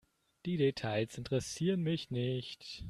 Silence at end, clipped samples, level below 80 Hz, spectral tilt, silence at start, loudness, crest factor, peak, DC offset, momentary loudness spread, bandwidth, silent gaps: 0 s; under 0.1%; -62 dBFS; -6 dB/octave; 0.45 s; -36 LUFS; 16 dB; -20 dBFS; under 0.1%; 7 LU; 13 kHz; none